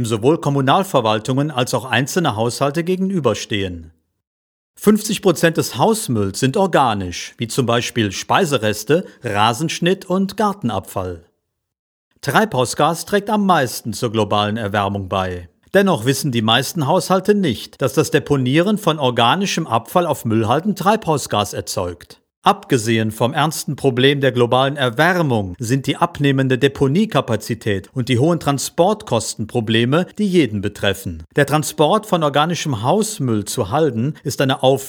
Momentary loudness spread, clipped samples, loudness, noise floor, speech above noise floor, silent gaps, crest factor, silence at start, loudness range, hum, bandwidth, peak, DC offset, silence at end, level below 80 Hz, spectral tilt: 7 LU; under 0.1%; -18 LUFS; -71 dBFS; 54 dB; 4.27-4.74 s, 11.79-12.11 s, 22.37-22.42 s; 18 dB; 0 s; 3 LU; none; over 20 kHz; 0 dBFS; under 0.1%; 0 s; -52 dBFS; -5 dB/octave